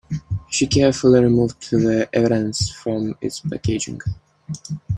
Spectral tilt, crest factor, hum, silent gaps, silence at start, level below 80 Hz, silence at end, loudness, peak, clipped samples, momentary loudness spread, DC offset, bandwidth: -5.5 dB/octave; 18 dB; none; none; 0.1 s; -44 dBFS; 0 s; -19 LUFS; -2 dBFS; under 0.1%; 16 LU; under 0.1%; 12.5 kHz